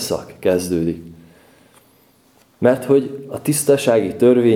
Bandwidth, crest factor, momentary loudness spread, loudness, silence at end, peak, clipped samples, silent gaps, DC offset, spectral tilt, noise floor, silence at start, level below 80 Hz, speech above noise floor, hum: 17 kHz; 18 dB; 10 LU; -18 LUFS; 0 s; 0 dBFS; under 0.1%; none; under 0.1%; -5.5 dB/octave; -54 dBFS; 0 s; -54 dBFS; 38 dB; none